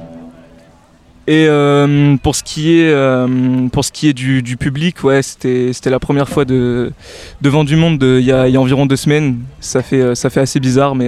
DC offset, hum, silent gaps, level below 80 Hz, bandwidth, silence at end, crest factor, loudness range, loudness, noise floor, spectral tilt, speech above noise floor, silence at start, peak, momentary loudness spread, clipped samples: under 0.1%; none; none; -38 dBFS; 13.5 kHz; 0 s; 12 dB; 3 LU; -13 LUFS; -45 dBFS; -6 dB/octave; 33 dB; 0 s; 0 dBFS; 7 LU; under 0.1%